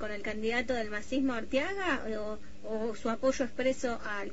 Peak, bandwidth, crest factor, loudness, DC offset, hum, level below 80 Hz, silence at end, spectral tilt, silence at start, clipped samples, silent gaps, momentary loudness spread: -16 dBFS; 8 kHz; 16 dB; -33 LUFS; 1%; none; -54 dBFS; 0 s; -4 dB/octave; 0 s; under 0.1%; none; 7 LU